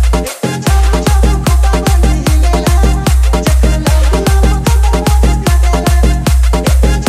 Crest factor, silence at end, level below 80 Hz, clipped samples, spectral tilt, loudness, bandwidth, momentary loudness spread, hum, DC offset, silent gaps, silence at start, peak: 8 dB; 0 s; -10 dBFS; 0.1%; -5.5 dB/octave; -11 LUFS; 15.5 kHz; 1 LU; none; under 0.1%; none; 0 s; 0 dBFS